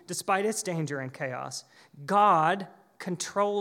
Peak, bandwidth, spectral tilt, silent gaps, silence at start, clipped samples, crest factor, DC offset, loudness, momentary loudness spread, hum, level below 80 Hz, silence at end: -10 dBFS; 17 kHz; -4 dB/octave; none; 0.1 s; under 0.1%; 18 dB; under 0.1%; -28 LUFS; 18 LU; none; -84 dBFS; 0 s